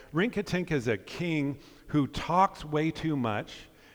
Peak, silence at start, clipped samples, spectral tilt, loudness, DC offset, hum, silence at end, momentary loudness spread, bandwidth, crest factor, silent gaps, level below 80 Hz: -12 dBFS; 0 s; under 0.1%; -6.5 dB/octave; -30 LUFS; under 0.1%; none; 0.3 s; 10 LU; over 20 kHz; 18 dB; none; -52 dBFS